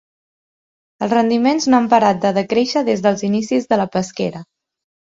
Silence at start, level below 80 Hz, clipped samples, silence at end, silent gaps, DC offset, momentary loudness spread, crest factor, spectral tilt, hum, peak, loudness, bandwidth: 1 s; -58 dBFS; under 0.1%; 0.6 s; none; under 0.1%; 10 LU; 18 dB; -5.5 dB/octave; none; 0 dBFS; -17 LUFS; 7.8 kHz